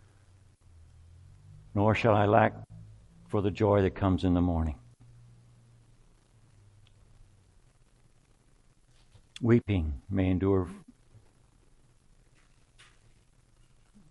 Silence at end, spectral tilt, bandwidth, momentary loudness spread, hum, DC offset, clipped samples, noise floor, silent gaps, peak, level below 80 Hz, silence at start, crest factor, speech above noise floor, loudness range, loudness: 3.3 s; -8.5 dB/octave; 10.5 kHz; 23 LU; none; under 0.1%; under 0.1%; -63 dBFS; none; -8 dBFS; -50 dBFS; 1.75 s; 24 dB; 37 dB; 8 LU; -28 LUFS